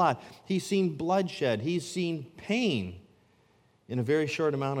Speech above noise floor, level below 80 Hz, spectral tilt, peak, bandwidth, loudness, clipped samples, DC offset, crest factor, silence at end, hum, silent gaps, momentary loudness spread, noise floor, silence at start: 36 dB; -72 dBFS; -6 dB/octave; -12 dBFS; 16 kHz; -30 LUFS; under 0.1%; under 0.1%; 18 dB; 0 s; none; none; 7 LU; -65 dBFS; 0 s